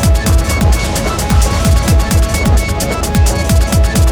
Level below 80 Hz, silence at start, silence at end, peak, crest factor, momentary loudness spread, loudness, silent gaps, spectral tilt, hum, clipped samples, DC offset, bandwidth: -14 dBFS; 0 s; 0 s; 0 dBFS; 10 dB; 3 LU; -12 LUFS; none; -5 dB/octave; none; under 0.1%; under 0.1%; over 20 kHz